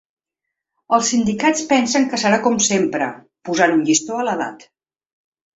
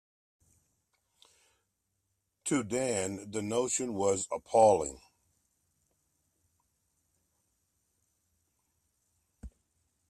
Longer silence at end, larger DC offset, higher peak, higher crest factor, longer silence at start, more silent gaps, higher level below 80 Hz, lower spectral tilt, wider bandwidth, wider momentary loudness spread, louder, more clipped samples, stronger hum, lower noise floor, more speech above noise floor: first, 1 s vs 0.6 s; neither; first, -2 dBFS vs -10 dBFS; second, 18 dB vs 24 dB; second, 0.9 s vs 2.45 s; neither; first, -58 dBFS vs -64 dBFS; about the same, -3 dB/octave vs -4 dB/octave; second, 8.2 kHz vs 14 kHz; second, 9 LU vs 12 LU; first, -17 LUFS vs -30 LUFS; neither; neither; about the same, -82 dBFS vs -81 dBFS; first, 64 dB vs 52 dB